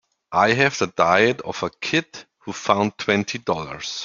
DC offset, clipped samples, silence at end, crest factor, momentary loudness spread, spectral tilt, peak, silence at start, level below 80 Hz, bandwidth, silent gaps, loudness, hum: under 0.1%; under 0.1%; 0 s; 20 dB; 12 LU; -4 dB/octave; -2 dBFS; 0.3 s; -60 dBFS; 7.6 kHz; none; -21 LUFS; none